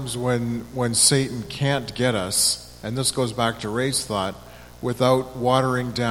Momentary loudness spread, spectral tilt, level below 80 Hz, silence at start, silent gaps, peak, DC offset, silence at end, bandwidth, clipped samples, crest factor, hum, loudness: 11 LU; -3.5 dB/octave; -48 dBFS; 0 s; none; -2 dBFS; under 0.1%; 0 s; 17 kHz; under 0.1%; 20 dB; 60 Hz at -45 dBFS; -22 LUFS